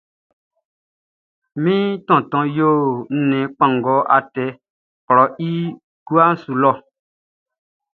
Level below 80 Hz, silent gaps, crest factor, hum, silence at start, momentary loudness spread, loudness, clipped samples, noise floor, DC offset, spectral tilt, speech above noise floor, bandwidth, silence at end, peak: -66 dBFS; 4.70-5.08 s, 5.84-6.06 s; 18 dB; none; 1.55 s; 11 LU; -17 LUFS; under 0.1%; under -90 dBFS; under 0.1%; -10 dB/octave; over 73 dB; 4.5 kHz; 1.15 s; 0 dBFS